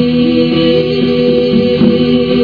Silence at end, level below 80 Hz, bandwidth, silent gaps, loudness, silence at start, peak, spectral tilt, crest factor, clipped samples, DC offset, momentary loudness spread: 0 s; -38 dBFS; 5.2 kHz; none; -10 LUFS; 0 s; 0 dBFS; -8.5 dB/octave; 10 dB; under 0.1%; 0.8%; 2 LU